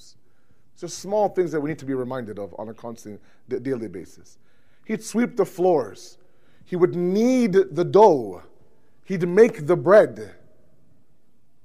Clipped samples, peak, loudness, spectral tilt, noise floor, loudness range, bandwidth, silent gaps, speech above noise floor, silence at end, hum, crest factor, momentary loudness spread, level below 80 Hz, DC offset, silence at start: under 0.1%; -4 dBFS; -21 LUFS; -6.5 dB/octave; -67 dBFS; 11 LU; 15 kHz; none; 45 dB; 1.35 s; none; 20 dB; 21 LU; -66 dBFS; 0.5%; 0.8 s